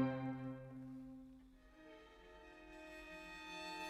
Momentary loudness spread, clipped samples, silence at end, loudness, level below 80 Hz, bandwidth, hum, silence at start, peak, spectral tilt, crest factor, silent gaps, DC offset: 16 LU; under 0.1%; 0 s; -51 LUFS; -70 dBFS; 15 kHz; none; 0 s; -26 dBFS; -6 dB/octave; 22 dB; none; under 0.1%